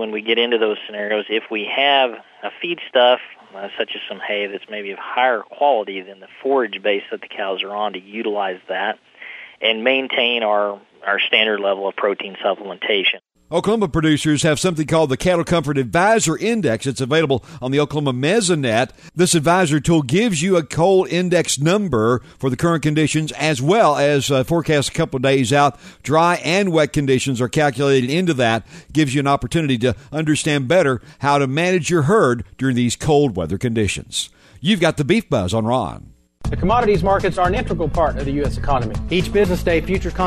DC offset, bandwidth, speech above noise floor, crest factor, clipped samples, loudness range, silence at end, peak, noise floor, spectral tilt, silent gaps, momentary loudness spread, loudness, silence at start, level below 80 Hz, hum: under 0.1%; 13.5 kHz; 20 dB; 18 dB; under 0.1%; 4 LU; 0 s; -2 dBFS; -38 dBFS; -5 dB/octave; none; 9 LU; -18 LUFS; 0 s; -38 dBFS; none